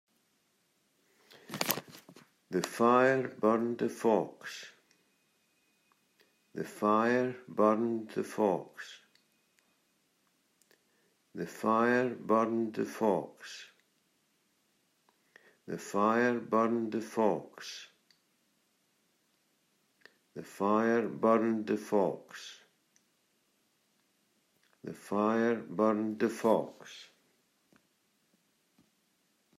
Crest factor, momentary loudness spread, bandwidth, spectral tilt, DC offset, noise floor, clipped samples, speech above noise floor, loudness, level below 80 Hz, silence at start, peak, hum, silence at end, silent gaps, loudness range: 30 dB; 19 LU; 16 kHz; -5.5 dB/octave; under 0.1%; -75 dBFS; under 0.1%; 44 dB; -31 LUFS; -84 dBFS; 1.5 s; -4 dBFS; none; 2.55 s; none; 8 LU